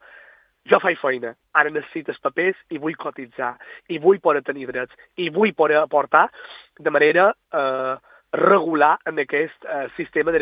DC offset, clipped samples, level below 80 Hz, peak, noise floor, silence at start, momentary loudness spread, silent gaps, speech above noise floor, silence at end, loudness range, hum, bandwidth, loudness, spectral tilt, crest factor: under 0.1%; under 0.1%; -64 dBFS; 0 dBFS; -51 dBFS; 0.7 s; 13 LU; none; 30 dB; 0 s; 4 LU; none; 5 kHz; -20 LUFS; -8.5 dB/octave; 20 dB